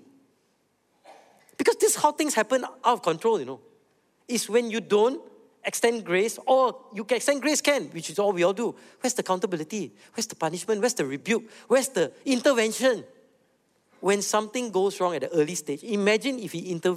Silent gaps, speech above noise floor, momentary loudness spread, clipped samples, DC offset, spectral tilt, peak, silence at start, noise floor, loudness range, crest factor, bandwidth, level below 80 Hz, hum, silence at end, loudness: none; 44 dB; 9 LU; under 0.1%; under 0.1%; -3.5 dB/octave; -6 dBFS; 1.1 s; -69 dBFS; 2 LU; 20 dB; 16 kHz; -80 dBFS; none; 0 s; -25 LUFS